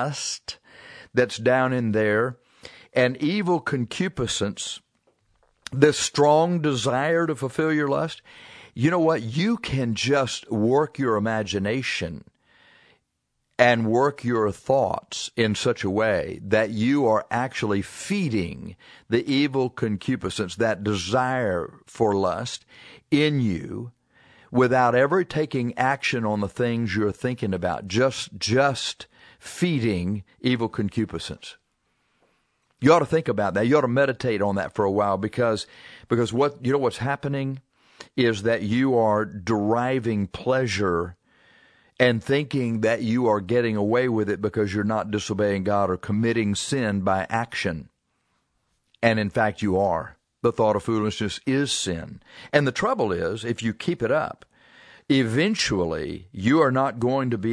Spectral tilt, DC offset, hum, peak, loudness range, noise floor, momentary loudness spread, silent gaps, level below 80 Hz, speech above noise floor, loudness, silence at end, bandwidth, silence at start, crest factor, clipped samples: -5.5 dB/octave; under 0.1%; none; -2 dBFS; 3 LU; -76 dBFS; 10 LU; none; -56 dBFS; 53 dB; -23 LUFS; 0 s; 11 kHz; 0 s; 22 dB; under 0.1%